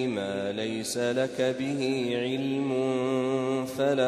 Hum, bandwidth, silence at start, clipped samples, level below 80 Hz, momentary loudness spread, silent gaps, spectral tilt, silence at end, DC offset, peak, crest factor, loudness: none; 13.5 kHz; 0 s; under 0.1%; -68 dBFS; 3 LU; none; -5 dB/octave; 0 s; under 0.1%; -12 dBFS; 14 dB; -28 LUFS